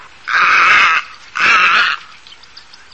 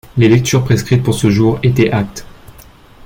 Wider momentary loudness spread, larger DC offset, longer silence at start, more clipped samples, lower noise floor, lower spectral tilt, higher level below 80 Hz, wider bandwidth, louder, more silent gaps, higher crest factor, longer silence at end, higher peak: about the same, 10 LU vs 8 LU; first, 0.6% vs under 0.1%; about the same, 0.25 s vs 0.15 s; neither; about the same, -40 dBFS vs -40 dBFS; second, 0 dB/octave vs -6.5 dB/octave; second, -56 dBFS vs -38 dBFS; second, 8.6 kHz vs 16.5 kHz; first, -10 LUFS vs -13 LUFS; neither; about the same, 14 dB vs 12 dB; first, 0.95 s vs 0.55 s; about the same, 0 dBFS vs -2 dBFS